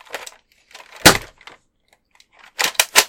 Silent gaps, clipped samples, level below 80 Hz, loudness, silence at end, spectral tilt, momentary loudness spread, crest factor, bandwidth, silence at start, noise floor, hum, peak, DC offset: none; 0.2%; -44 dBFS; -15 LUFS; 0 s; -1.5 dB/octave; 23 LU; 20 dB; 17 kHz; 0.15 s; -62 dBFS; none; 0 dBFS; under 0.1%